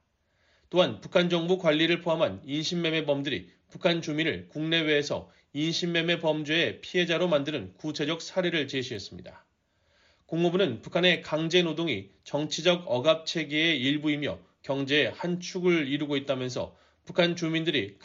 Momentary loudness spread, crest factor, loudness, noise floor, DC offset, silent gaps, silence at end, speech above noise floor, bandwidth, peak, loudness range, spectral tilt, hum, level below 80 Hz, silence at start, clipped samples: 10 LU; 18 dB; -27 LUFS; -71 dBFS; under 0.1%; none; 0.1 s; 43 dB; 7.6 kHz; -10 dBFS; 3 LU; -3.5 dB/octave; none; -68 dBFS; 0.7 s; under 0.1%